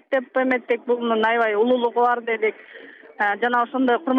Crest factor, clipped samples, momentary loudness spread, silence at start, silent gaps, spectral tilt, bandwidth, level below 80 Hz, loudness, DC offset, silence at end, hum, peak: 14 dB; under 0.1%; 5 LU; 0.1 s; none; -6 dB/octave; 5.2 kHz; -72 dBFS; -21 LUFS; under 0.1%; 0 s; none; -8 dBFS